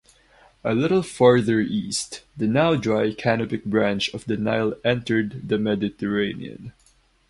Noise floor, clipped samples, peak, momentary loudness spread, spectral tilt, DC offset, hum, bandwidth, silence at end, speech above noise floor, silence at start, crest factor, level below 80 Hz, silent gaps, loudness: -60 dBFS; under 0.1%; -2 dBFS; 10 LU; -5.5 dB/octave; under 0.1%; none; 11.5 kHz; 0.6 s; 38 dB; 0.65 s; 20 dB; -54 dBFS; none; -22 LUFS